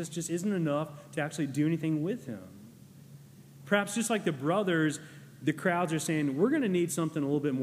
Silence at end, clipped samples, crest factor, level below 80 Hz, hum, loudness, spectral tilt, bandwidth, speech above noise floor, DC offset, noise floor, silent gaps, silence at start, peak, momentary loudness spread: 0 s; under 0.1%; 20 dB; -76 dBFS; none; -30 LUFS; -5.5 dB/octave; 15.5 kHz; 22 dB; under 0.1%; -52 dBFS; none; 0 s; -12 dBFS; 9 LU